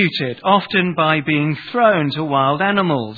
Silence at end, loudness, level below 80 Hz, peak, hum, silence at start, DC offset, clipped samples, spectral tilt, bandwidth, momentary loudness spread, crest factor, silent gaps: 0 s; -17 LUFS; -60 dBFS; 0 dBFS; none; 0 s; under 0.1%; under 0.1%; -8.5 dB/octave; 4.9 kHz; 4 LU; 16 dB; none